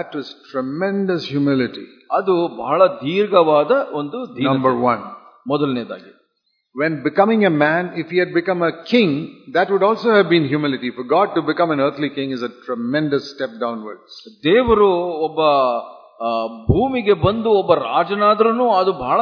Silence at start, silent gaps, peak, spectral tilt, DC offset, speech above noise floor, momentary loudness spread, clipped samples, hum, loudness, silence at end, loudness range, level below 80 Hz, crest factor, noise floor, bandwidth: 0 s; none; 0 dBFS; -8 dB/octave; under 0.1%; 51 dB; 12 LU; under 0.1%; none; -18 LUFS; 0 s; 3 LU; -46 dBFS; 18 dB; -69 dBFS; 5.4 kHz